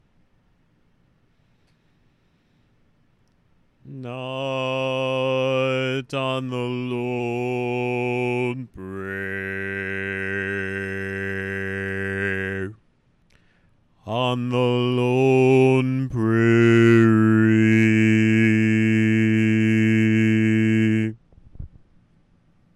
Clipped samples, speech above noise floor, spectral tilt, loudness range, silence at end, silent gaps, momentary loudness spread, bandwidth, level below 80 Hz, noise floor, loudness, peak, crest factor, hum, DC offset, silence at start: under 0.1%; 37 dB; -7.5 dB/octave; 11 LU; 1.1 s; none; 12 LU; 11.5 kHz; -56 dBFS; -63 dBFS; -21 LUFS; -6 dBFS; 16 dB; none; under 0.1%; 3.85 s